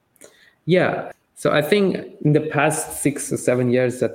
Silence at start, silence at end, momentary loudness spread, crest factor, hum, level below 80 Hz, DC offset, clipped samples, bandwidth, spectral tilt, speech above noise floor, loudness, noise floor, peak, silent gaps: 0.65 s; 0 s; 6 LU; 18 dB; none; -60 dBFS; under 0.1%; under 0.1%; 16.5 kHz; -5.5 dB/octave; 31 dB; -20 LUFS; -50 dBFS; -2 dBFS; none